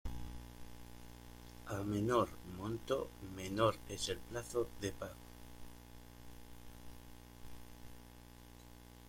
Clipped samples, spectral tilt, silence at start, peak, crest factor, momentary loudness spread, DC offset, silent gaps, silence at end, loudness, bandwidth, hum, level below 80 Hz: under 0.1%; -5 dB/octave; 0.05 s; -18 dBFS; 24 dB; 22 LU; under 0.1%; none; 0 s; -40 LUFS; 16.5 kHz; 60 Hz at -55 dBFS; -56 dBFS